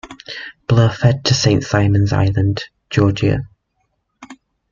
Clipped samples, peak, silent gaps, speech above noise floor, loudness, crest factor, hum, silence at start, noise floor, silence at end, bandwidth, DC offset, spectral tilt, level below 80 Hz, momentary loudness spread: under 0.1%; -2 dBFS; none; 53 dB; -16 LUFS; 14 dB; none; 0.05 s; -68 dBFS; 0.4 s; 7.4 kHz; under 0.1%; -6 dB/octave; -40 dBFS; 15 LU